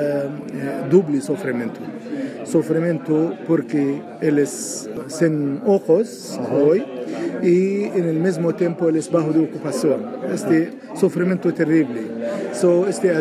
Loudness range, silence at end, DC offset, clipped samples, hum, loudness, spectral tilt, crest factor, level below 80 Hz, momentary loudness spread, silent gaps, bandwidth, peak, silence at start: 2 LU; 0 s; under 0.1%; under 0.1%; none; -20 LUFS; -6.5 dB/octave; 18 dB; -70 dBFS; 10 LU; none; 13.5 kHz; -2 dBFS; 0 s